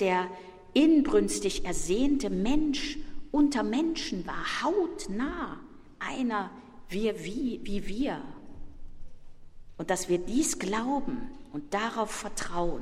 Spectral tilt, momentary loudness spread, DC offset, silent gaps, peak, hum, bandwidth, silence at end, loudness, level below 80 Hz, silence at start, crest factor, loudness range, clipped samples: -4 dB/octave; 13 LU; under 0.1%; none; -12 dBFS; none; 15 kHz; 0 s; -30 LUFS; -44 dBFS; 0 s; 18 dB; 7 LU; under 0.1%